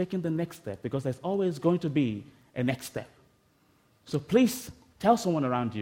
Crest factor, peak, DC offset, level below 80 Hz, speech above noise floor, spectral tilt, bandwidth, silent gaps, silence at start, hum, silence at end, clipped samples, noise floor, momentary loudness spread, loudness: 20 dB; -8 dBFS; under 0.1%; -64 dBFS; 38 dB; -6.5 dB/octave; 16.5 kHz; none; 0 s; none; 0 s; under 0.1%; -66 dBFS; 14 LU; -29 LUFS